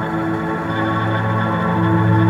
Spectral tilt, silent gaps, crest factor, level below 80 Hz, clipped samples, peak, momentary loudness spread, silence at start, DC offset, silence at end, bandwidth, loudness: -8.5 dB/octave; none; 12 dB; -46 dBFS; under 0.1%; -4 dBFS; 5 LU; 0 s; under 0.1%; 0 s; 7.4 kHz; -18 LUFS